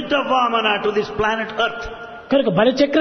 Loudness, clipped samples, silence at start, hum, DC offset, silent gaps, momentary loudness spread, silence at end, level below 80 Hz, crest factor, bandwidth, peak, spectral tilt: -18 LUFS; under 0.1%; 0 s; none; under 0.1%; none; 10 LU; 0 s; -46 dBFS; 16 dB; 6.6 kHz; -2 dBFS; -5.5 dB/octave